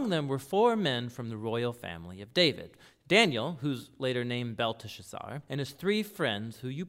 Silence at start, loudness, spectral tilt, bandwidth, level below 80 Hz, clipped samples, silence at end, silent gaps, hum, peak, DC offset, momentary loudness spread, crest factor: 0 s; -30 LUFS; -5 dB/octave; 16 kHz; -70 dBFS; under 0.1%; 0 s; none; none; -10 dBFS; under 0.1%; 16 LU; 22 dB